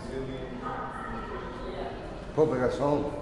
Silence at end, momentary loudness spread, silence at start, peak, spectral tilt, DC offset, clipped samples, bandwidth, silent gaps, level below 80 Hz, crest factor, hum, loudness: 0 s; 11 LU; 0 s; -12 dBFS; -7 dB/octave; 0.1%; under 0.1%; 11 kHz; none; -46 dBFS; 20 dB; none; -32 LUFS